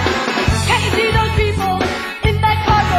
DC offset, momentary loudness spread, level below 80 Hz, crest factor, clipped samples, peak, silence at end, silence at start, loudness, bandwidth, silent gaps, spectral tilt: under 0.1%; 4 LU; -24 dBFS; 14 dB; under 0.1%; -2 dBFS; 0 s; 0 s; -16 LUFS; 16 kHz; none; -5 dB/octave